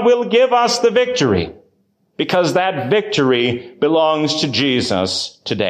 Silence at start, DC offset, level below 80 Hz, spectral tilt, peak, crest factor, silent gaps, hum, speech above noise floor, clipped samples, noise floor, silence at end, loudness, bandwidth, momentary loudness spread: 0 s; under 0.1%; -46 dBFS; -4.5 dB/octave; -4 dBFS; 12 dB; none; none; 46 dB; under 0.1%; -61 dBFS; 0 s; -16 LUFS; 13.5 kHz; 7 LU